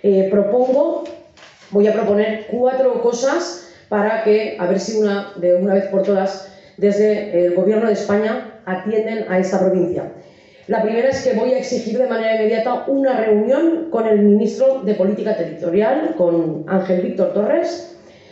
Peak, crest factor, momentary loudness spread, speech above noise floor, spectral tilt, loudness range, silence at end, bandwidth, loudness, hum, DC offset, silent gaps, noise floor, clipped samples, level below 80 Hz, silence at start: -4 dBFS; 14 dB; 7 LU; 28 dB; -6.5 dB/octave; 3 LU; 0.4 s; 8 kHz; -17 LUFS; none; under 0.1%; none; -44 dBFS; under 0.1%; -62 dBFS; 0.05 s